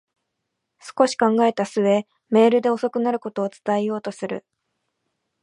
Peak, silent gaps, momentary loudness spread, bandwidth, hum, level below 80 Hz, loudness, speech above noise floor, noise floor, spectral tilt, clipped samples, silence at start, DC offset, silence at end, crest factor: -2 dBFS; none; 12 LU; 11 kHz; none; -76 dBFS; -21 LUFS; 58 dB; -79 dBFS; -5.5 dB/octave; under 0.1%; 0.85 s; under 0.1%; 1.05 s; 20 dB